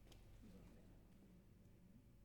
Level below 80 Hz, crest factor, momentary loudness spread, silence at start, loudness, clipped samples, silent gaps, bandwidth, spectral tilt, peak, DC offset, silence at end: -70 dBFS; 16 dB; 5 LU; 0 s; -67 LUFS; under 0.1%; none; 19 kHz; -6 dB/octave; -48 dBFS; under 0.1%; 0 s